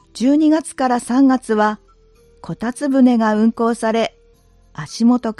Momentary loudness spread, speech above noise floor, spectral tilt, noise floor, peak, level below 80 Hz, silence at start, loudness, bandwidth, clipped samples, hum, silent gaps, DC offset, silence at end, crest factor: 15 LU; 36 dB; -5.5 dB/octave; -51 dBFS; -4 dBFS; -54 dBFS; 0.15 s; -16 LUFS; 12 kHz; under 0.1%; none; none; under 0.1%; 0.05 s; 14 dB